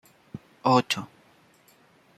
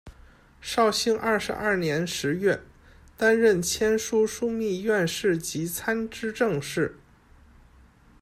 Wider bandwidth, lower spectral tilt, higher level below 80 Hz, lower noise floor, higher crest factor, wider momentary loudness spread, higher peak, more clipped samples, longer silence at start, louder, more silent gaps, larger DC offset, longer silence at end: second, 14 kHz vs 15.5 kHz; about the same, -5 dB/octave vs -4 dB/octave; second, -70 dBFS vs -54 dBFS; first, -59 dBFS vs -55 dBFS; first, 22 dB vs 16 dB; first, 23 LU vs 7 LU; first, -6 dBFS vs -10 dBFS; neither; first, 0.35 s vs 0.05 s; about the same, -25 LUFS vs -25 LUFS; neither; neither; about the same, 1.15 s vs 1.25 s